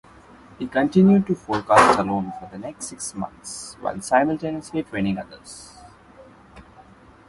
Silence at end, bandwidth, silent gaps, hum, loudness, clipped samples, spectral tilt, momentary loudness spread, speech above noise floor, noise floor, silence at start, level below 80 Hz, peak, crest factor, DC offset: 0.65 s; 11.5 kHz; none; none; -21 LUFS; under 0.1%; -5.5 dB/octave; 19 LU; 27 dB; -49 dBFS; 0.6 s; -52 dBFS; 0 dBFS; 22 dB; under 0.1%